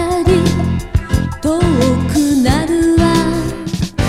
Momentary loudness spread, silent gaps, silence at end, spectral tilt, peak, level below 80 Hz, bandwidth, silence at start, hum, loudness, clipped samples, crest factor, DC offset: 7 LU; none; 0 s; -6 dB/octave; 0 dBFS; -24 dBFS; 15.5 kHz; 0 s; none; -14 LUFS; under 0.1%; 12 dB; under 0.1%